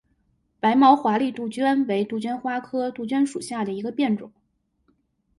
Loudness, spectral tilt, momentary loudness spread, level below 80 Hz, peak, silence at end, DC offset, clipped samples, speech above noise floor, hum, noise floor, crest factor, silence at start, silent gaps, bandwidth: -23 LUFS; -5.5 dB/octave; 11 LU; -68 dBFS; -4 dBFS; 1.1 s; under 0.1%; under 0.1%; 47 dB; none; -69 dBFS; 20 dB; 0.65 s; none; 11.5 kHz